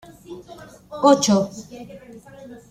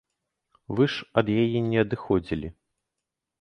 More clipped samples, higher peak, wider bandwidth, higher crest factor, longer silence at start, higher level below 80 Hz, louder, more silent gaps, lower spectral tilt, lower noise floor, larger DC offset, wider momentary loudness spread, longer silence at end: neither; first, -2 dBFS vs -6 dBFS; first, 14 kHz vs 8.8 kHz; about the same, 20 dB vs 22 dB; second, 0.3 s vs 0.7 s; second, -58 dBFS vs -50 dBFS; first, -18 LUFS vs -25 LUFS; neither; second, -4.5 dB/octave vs -8 dB/octave; second, -43 dBFS vs -85 dBFS; neither; first, 26 LU vs 10 LU; second, 0.15 s vs 0.9 s